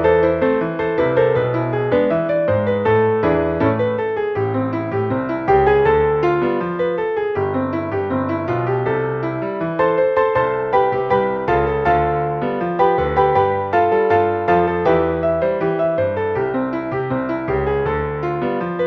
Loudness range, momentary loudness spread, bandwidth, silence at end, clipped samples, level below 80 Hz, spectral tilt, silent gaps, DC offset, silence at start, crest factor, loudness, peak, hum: 3 LU; 6 LU; 6 kHz; 0 s; under 0.1%; -40 dBFS; -9 dB/octave; none; under 0.1%; 0 s; 16 dB; -18 LUFS; -2 dBFS; none